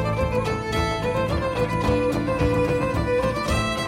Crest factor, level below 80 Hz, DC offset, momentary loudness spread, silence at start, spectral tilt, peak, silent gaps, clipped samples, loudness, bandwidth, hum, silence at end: 14 dB; -34 dBFS; under 0.1%; 2 LU; 0 s; -6 dB/octave; -8 dBFS; none; under 0.1%; -23 LUFS; 16 kHz; none; 0 s